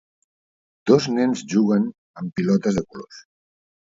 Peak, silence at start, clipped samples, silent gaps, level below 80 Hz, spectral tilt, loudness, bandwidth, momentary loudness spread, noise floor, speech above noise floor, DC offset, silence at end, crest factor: -2 dBFS; 0.85 s; under 0.1%; 1.98-2.14 s; -56 dBFS; -6.5 dB/octave; -21 LUFS; 7.8 kHz; 17 LU; under -90 dBFS; over 70 dB; under 0.1%; 0.75 s; 20 dB